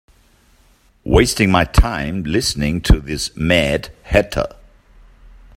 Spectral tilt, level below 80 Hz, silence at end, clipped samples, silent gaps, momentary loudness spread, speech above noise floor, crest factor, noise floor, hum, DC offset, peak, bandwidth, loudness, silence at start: -5 dB/octave; -24 dBFS; 1.1 s; under 0.1%; none; 10 LU; 38 dB; 18 dB; -54 dBFS; none; under 0.1%; 0 dBFS; 16 kHz; -17 LUFS; 1.05 s